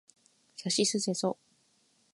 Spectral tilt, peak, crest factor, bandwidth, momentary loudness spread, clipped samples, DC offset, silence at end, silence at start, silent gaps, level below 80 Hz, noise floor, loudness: -3.5 dB/octave; -16 dBFS; 20 dB; 11.5 kHz; 17 LU; under 0.1%; under 0.1%; 0.8 s; 0.6 s; none; -82 dBFS; -70 dBFS; -30 LUFS